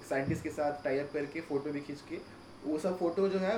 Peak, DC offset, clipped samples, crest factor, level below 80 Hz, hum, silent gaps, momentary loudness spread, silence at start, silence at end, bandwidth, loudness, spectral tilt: -20 dBFS; under 0.1%; under 0.1%; 14 dB; -64 dBFS; none; none; 12 LU; 0 s; 0 s; 16.5 kHz; -35 LUFS; -6.5 dB/octave